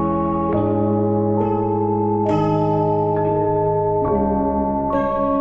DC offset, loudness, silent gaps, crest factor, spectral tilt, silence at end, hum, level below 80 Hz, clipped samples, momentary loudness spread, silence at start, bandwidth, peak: under 0.1%; -19 LUFS; none; 12 dB; -10.5 dB/octave; 0 s; none; -38 dBFS; under 0.1%; 2 LU; 0 s; 5.8 kHz; -6 dBFS